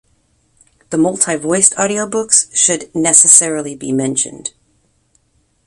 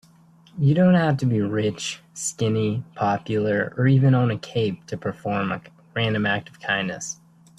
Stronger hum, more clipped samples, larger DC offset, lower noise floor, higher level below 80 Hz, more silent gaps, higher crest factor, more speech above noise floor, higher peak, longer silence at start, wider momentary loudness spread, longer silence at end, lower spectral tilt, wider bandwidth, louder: neither; first, 0.2% vs under 0.1%; neither; first, -60 dBFS vs -53 dBFS; about the same, -56 dBFS vs -58 dBFS; neither; about the same, 16 dB vs 16 dB; first, 46 dB vs 31 dB; first, 0 dBFS vs -6 dBFS; first, 0.9 s vs 0.55 s; about the same, 14 LU vs 13 LU; first, 1.15 s vs 0.45 s; second, -2.5 dB/octave vs -6 dB/octave; first, 16 kHz vs 12 kHz; first, -12 LUFS vs -23 LUFS